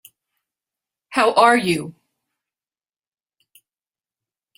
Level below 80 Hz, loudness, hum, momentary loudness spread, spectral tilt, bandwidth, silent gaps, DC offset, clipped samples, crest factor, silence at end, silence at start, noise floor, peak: -66 dBFS; -17 LUFS; none; 11 LU; -4.5 dB/octave; 16 kHz; none; under 0.1%; under 0.1%; 24 dB; 2.65 s; 1.1 s; under -90 dBFS; 0 dBFS